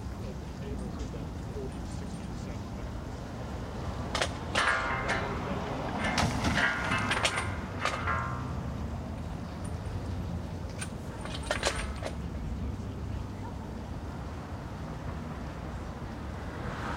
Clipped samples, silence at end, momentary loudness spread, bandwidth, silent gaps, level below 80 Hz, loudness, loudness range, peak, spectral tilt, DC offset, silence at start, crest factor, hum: under 0.1%; 0 s; 12 LU; 16 kHz; none; -42 dBFS; -34 LUFS; 9 LU; -10 dBFS; -4.5 dB/octave; under 0.1%; 0 s; 24 dB; none